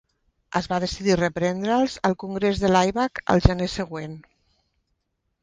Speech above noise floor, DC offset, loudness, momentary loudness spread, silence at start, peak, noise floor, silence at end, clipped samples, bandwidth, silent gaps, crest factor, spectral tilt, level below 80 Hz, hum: 53 dB; under 0.1%; -23 LUFS; 11 LU; 0.5 s; 0 dBFS; -75 dBFS; 1.2 s; under 0.1%; 9.8 kHz; none; 24 dB; -6 dB/octave; -36 dBFS; none